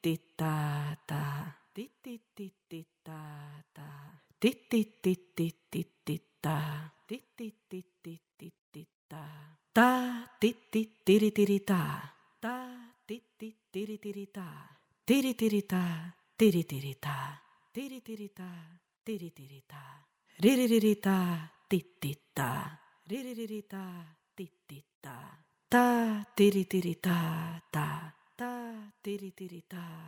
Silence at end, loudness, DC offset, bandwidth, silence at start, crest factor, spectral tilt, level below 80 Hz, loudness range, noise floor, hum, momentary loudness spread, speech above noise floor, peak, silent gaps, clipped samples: 0 s; -32 LUFS; under 0.1%; over 20 kHz; 0.05 s; 22 dB; -6 dB/octave; -74 dBFS; 11 LU; -54 dBFS; none; 23 LU; 22 dB; -10 dBFS; 8.34-8.38 s, 8.59-8.72 s, 8.94-9.09 s, 24.95-25.01 s; under 0.1%